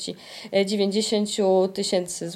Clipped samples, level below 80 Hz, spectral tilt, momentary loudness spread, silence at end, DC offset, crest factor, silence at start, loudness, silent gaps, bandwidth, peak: under 0.1%; -68 dBFS; -4 dB/octave; 6 LU; 0 s; under 0.1%; 14 dB; 0 s; -23 LUFS; none; 14 kHz; -10 dBFS